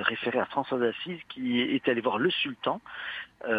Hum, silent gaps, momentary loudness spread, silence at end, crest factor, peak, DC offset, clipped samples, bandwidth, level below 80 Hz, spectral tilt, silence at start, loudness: none; none; 10 LU; 0 s; 22 dB; -8 dBFS; under 0.1%; under 0.1%; 5 kHz; -70 dBFS; -7 dB/octave; 0 s; -29 LUFS